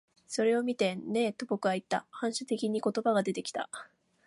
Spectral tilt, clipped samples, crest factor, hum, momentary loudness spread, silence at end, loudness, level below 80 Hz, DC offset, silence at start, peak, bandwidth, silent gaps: -4.5 dB/octave; under 0.1%; 16 dB; none; 9 LU; 0.4 s; -32 LUFS; -80 dBFS; under 0.1%; 0.3 s; -14 dBFS; 11.5 kHz; none